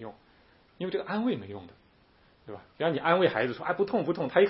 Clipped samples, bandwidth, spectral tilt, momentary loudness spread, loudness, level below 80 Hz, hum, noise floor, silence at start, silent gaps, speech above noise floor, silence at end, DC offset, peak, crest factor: under 0.1%; 5.8 kHz; -10 dB/octave; 22 LU; -29 LUFS; -68 dBFS; none; -62 dBFS; 0 s; none; 34 dB; 0 s; under 0.1%; -8 dBFS; 22 dB